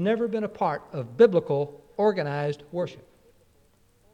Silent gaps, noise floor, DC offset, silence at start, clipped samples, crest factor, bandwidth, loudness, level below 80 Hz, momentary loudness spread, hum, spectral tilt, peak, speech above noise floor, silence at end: none; -61 dBFS; under 0.1%; 0 s; under 0.1%; 20 dB; 8 kHz; -26 LUFS; -66 dBFS; 13 LU; none; -8 dB/octave; -6 dBFS; 37 dB; 1.15 s